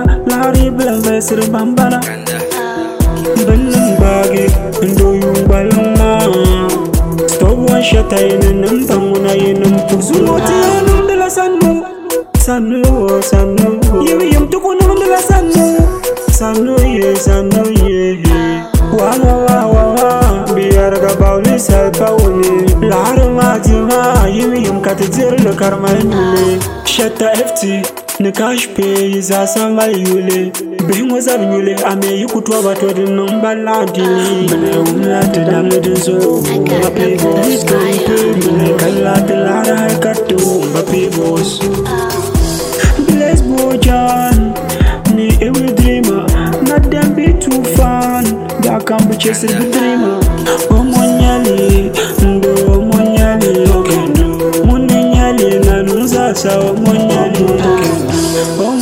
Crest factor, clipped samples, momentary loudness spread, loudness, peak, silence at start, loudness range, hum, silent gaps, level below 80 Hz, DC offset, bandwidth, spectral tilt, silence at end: 10 dB; 0.5%; 4 LU; -11 LUFS; 0 dBFS; 0 s; 3 LU; none; none; -18 dBFS; under 0.1%; 16.5 kHz; -5.5 dB/octave; 0 s